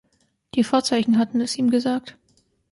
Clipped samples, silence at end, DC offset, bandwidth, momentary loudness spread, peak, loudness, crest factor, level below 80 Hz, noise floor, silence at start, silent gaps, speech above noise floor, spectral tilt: under 0.1%; 0.6 s; under 0.1%; 11.5 kHz; 7 LU; -8 dBFS; -21 LUFS; 16 dB; -64 dBFS; -67 dBFS; 0.55 s; none; 46 dB; -4.5 dB/octave